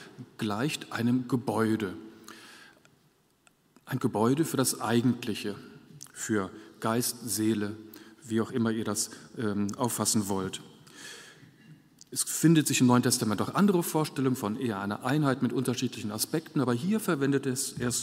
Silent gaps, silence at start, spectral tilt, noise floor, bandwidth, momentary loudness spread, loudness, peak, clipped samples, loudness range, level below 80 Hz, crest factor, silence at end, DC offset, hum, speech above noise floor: none; 0 s; -4.5 dB/octave; -67 dBFS; 16 kHz; 19 LU; -29 LUFS; -8 dBFS; under 0.1%; 6 LU; -70 dBFS; 20 dB; 0 s; under 0.1%; none; 38 dB